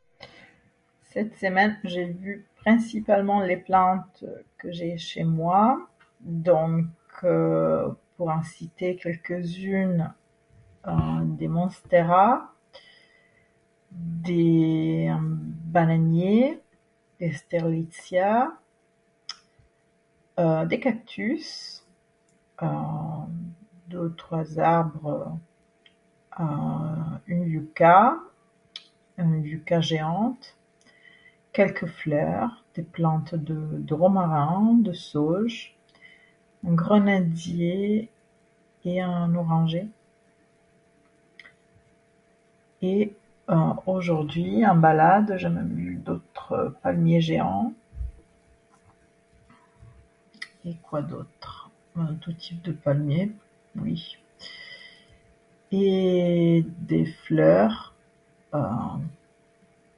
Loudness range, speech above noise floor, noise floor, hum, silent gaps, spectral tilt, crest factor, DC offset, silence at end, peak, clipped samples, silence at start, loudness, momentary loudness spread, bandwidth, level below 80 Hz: 8 LU; 42 dB; -66 dBFS; none; none; -8 dB/octave; 22 dB; under 0.1%; 0.85 s; -4 dBFS; under 0.1%; 0.25 s; -24 LUFS; 19 LU; 10.5 kHz; -54 dBFS